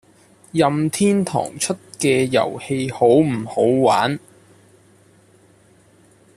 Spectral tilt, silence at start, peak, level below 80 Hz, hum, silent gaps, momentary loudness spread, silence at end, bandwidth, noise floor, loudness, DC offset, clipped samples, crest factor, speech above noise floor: -5 dB/octave; 0.55 s; -4 dBFS; -58 dBFS; none; none; 9 LU; 2.2 s; 14 kHz; -53 dBFS; -19 LUFS; under 0.1%; under 0.1%; 16 dB; 35 dB